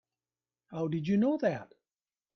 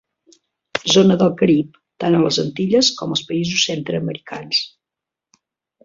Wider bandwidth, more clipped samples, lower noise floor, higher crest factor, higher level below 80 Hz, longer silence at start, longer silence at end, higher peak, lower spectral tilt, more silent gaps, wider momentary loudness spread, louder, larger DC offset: second, 6.4 kHz vs 7.6 kHz; neither; first, under -90 dBFS vs -86 dBFS; about the same, 16 dB vs 18 dB; second, -72 dBFS vs -58 dBFS; about the same, 0.7 s vs 0.75 s; second, 0.7 s vs 1.15 s; second, -18 dBFS vs -2 dBFS; first, -8.5 dB/octave vs -4.5 dB/octave; neither; about the same, 13 LU vs 13 LU; second, -31 LUFS vs -17 LUFS; neither